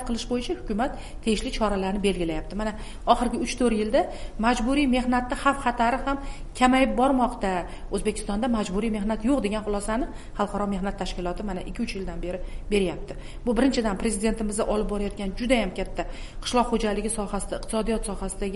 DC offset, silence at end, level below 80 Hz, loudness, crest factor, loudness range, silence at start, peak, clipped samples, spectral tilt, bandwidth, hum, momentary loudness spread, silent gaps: 0.4%; 0 s; -36 dBFS; -26 LUFS; 22 dB; 5 LU; 0 s; -4 dBFS; under 0.1%; -5 dB/octave; 11.5 kHz; none; 10 LU; none